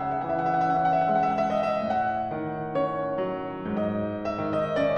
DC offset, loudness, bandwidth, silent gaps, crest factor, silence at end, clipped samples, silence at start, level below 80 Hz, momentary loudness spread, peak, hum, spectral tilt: under 0.1%; -27 LUFS; 6.6 kHz; none; 12 dB; 0 s; under 0.1%; 0 s; -56 dBFS; 7 LU; -14 dBFS; none; -8 dB/octave